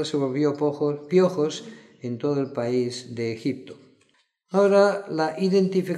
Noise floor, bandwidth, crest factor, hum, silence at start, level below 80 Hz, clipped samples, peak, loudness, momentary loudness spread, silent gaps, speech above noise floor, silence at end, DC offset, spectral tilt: -66 dBFS; 11 kHz; 16 dB; none; 0 s; -76 dBFS; under 0.1%; -8 dBFS; -24 LUFS; 12 LU; none; 42 dB; 0 s; under 0.1%; -6.5 dB/octave